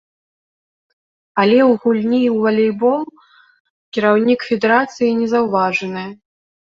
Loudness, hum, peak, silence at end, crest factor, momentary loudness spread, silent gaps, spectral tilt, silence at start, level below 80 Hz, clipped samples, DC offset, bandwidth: -16 LUFS; none; -2 dBFS; 0.6 s; 16 dB; 12 LU; 3.60-3.92 s; -6.5 dB/octave; 1.35 s; -62 dBFS; under 0.1%; under 0.1%; 7.4 kHz